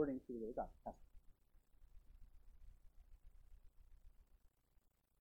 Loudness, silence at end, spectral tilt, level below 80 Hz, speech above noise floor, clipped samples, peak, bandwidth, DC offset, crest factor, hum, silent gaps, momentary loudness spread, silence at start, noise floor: -49 LUFS; 0.75 s; -9 dB/octave; -64 dBFS; 29 dB; under 0.1%; -28 dBFS; 16.5 kHz; under 0.1%; 24 dB; none; none; 12 LU; 0 s; -77 dBFS